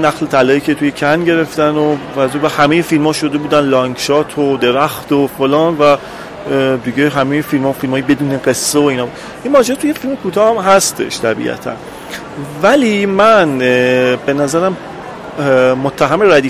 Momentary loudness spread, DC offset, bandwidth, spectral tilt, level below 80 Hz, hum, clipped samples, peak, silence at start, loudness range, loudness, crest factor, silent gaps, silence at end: 10 LU; under 0.1%; 16 kHz; -4.5 dB/octave; -46 dBFS; none; under 0.1%; 0 dBFS; 0 s; 2 LU; -13 LUFS; 12 dB; none; 0 s